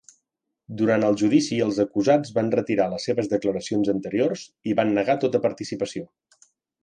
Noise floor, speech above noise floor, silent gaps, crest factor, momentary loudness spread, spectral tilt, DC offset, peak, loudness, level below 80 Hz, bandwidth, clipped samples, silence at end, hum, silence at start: -80 dBFS; 57 dB; none; 16 dB; 9 LU; -6 dB/octave; under 0.1%; -6 dBFS; -23 LUFS; -62 dBFS; 9.6 kHz; under 0.1%; 0.8 s; none; 0.7 s